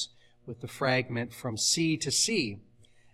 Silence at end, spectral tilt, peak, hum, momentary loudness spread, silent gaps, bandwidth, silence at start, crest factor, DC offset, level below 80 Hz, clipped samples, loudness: 0.5 s; -3 dB/octave; -12 dBFS; none; 17 LU; none; 16 kHz; 0 s; 18 dB; under 0.1%; -66 dBFS; under 0.1%; -28 LUFS